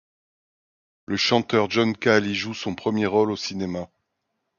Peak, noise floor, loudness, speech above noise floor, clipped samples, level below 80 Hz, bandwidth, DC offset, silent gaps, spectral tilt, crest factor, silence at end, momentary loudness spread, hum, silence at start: -4 dBFS; -78 dBFS; -23 LUFS; 55 dB; under 0.1%; -58 dBFS; 7.2 kHz; under 0.1%; none; -5 dB/octave; 20 dB; 0.7 s; 10 LU; none; 1.1 s